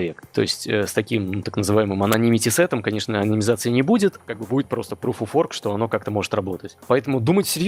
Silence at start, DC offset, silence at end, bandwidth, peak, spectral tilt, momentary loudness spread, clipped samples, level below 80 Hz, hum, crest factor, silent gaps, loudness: 0 s; under 0.1%; 0 s; 17.5 kHz; -2 dBFS; -5 dB/octave; 8 LU; under 0.1%; -62 dBFS; none; 18 dB; none; -21 LUFS